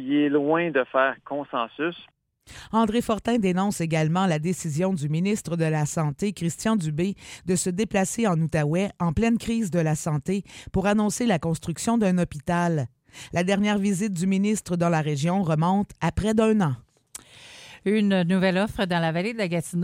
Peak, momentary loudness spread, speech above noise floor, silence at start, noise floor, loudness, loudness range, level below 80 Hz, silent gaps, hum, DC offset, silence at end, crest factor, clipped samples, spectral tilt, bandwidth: -6 dBFS; 8 LU; 23 dB; 0 s; -47 dBFS; -24 LUFS; 2 LU; -48 dBFS; none; none; under 0.1%; 0 s; 18 dB; under 0.1%; -6 dB/octave; 16 kHz